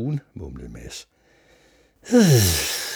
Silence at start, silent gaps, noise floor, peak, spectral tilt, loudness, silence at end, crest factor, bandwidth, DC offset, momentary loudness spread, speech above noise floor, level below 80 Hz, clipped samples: 0 s; none; -57 dBFS; -4 dBFS; -4.5 dB/octave; -18 LUFS; 0 s; 18 dB; over 20 kHz; under 0.1%; 23 LU; 37 dB; -44 dBFS; under 0.1%